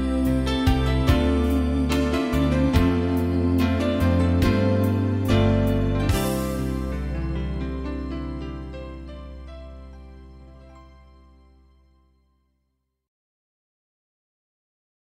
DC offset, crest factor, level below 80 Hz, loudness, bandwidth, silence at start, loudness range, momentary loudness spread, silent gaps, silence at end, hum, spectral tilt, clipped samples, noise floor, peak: under 0.1%; 18 dB; -30 dBFS; -23 LUFS; 16 kHz; 0 s; 17 LU; 17 LU; none; 4.35 s; none; -7 dB/octave; under 0.1%; -75 dBFS; -6 dBFS